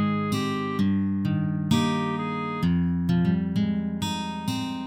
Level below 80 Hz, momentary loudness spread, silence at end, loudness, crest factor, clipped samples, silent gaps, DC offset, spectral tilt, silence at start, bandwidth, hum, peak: -50 dBFS; 6 LU; 0 s; -26 LUFS; 16 dB; under 0.1%; none; under 0.1%; -6.5 dB/octave; 0 s; 15.5 kHz; none; -10 dBFS